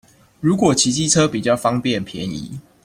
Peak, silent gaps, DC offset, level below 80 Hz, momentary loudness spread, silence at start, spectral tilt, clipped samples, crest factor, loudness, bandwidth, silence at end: -2 dBFS; none; under 0.1%; -50 dBFS; 12 LU; 0.4 s; -4 dB/octave; under 0.1%; 16 dB; -18 LUFS; 16 kHz; 0.25 s